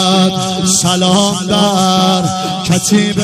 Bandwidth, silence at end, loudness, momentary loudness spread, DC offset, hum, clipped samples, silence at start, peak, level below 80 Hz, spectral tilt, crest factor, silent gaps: 15 kHz; 0 s; -11 LUFS; 4 LU; under 0.1%; none; under 0.1%; 0 s; 0 dBFS; -46 dBFS; -4 dB/octave; 10 dB; none